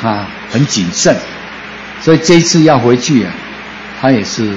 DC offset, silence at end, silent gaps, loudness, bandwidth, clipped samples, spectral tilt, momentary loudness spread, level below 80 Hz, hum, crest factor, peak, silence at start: under 0.1%; 0 s; none; -11 LUFS; 8 kHz; 0.3%; -4.5 dB/octave; 18 LU; -44 dBFS; none; 12 dB; 0 dBFS; 0 s